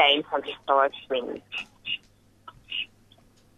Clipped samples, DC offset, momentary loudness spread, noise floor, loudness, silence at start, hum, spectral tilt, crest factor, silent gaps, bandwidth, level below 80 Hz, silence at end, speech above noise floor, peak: under 0.1%; under 0.1%; 11 LU; -59 dBFS; -28 LUFS; 0 s; none; -3.5 dB/octave; 22 dB; none; 11 kHz; -66 dBFS; 0.7 s; 32 dB; -6 dBFS